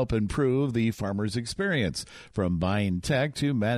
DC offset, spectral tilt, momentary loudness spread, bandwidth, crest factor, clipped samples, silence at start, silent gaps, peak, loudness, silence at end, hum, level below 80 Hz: under 0.1%; -6 dB/octave; 5 LU; 14.5 kHz; 14 dB; under 0.1%; 0 s; none; -14 dBFS; -28 LUFS; 0 s; none; -46 dBFS